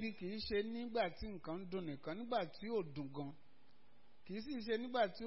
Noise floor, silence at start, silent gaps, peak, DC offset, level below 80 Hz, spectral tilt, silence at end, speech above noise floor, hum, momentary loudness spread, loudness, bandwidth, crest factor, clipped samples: -73 dBFS; 0 s; none; -24 dBFS; 0.2%; -64 dBFS; -4 dB/octave; 0 s; 30 dB; none; 9 LU; -43 LUFS; 5.8 kHz; 18 dB; under 0.1%